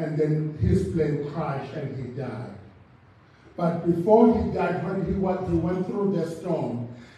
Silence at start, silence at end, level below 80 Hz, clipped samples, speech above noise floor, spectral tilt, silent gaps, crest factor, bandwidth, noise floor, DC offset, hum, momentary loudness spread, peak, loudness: 0 s; 0.1 s; -46 dBFS; under 0.1%; 29 dB; -9 dB/octave; none; 20 dB; 10.5 kHz; -54 dBFS; under 0.1%; none; 14 LU; -4 dBFS; -25 LUFS